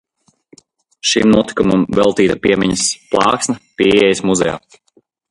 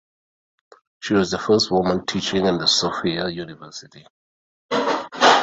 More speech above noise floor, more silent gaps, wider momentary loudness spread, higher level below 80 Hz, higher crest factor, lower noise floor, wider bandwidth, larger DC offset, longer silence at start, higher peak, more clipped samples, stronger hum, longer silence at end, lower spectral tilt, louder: second, 46 dB vs over 69 dB; second, none vs 4.10-4.69 s; second, 7 LU vs 17 LU; first, -44 dBFS vs -54 dBFS; about the same, 16 dB vs 20 dB; second, -59 dBFS vs under -90 dBFS; first, 11.5 kHz vs 8 kHz; neither; about the same, 1.05 s vs 1 s; about the same, 0 dBFS vs -2 dBFS; neither; neither; first, 0.7 s vs 0 s; about the same, -4 dB/octave vs -3.5 dB/octave; first, -14 LUFS vs -20 LUFS